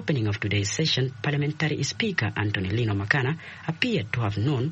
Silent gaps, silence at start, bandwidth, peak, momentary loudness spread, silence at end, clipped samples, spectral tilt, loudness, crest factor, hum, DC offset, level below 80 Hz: none; 0 s; 8.4 kHz; -6 dBFS; 4 LU; 0 s; under 0.1%; -5 dB/octave; -26 LUFS; 20 dB; none; under 0.1%; -56 dBFS